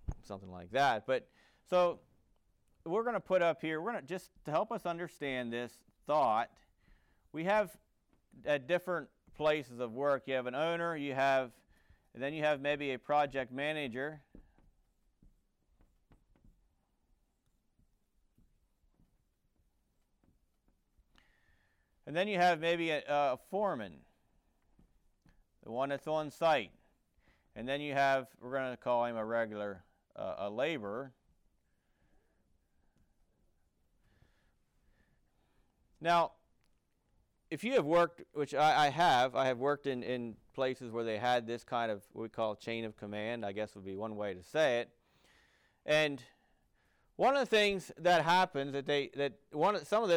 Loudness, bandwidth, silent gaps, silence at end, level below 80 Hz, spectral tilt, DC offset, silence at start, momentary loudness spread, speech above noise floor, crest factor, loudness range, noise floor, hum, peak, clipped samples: -34 LUFS; 16.5 kHz; none; 0 s; -64 dBFS; -5 dB/octave; under 0.1%; 0.1 s; 13 LU; 43 dB; 14 dB; 8 LU; -77 dBFS; none; -22 dBFS; under 0.1%